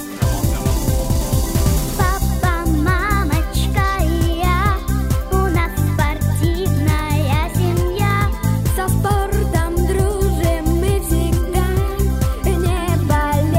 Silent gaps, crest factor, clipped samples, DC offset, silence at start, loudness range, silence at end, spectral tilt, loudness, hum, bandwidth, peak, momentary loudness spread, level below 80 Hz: none; 14 dB; under 0.1%; under 0.1%; 0 s; 0 LU; 0 s; -6 dB/octave; -18 LUFS; none; 16.5 kHz; -2 dBFS; 2 LU; -20 dBFS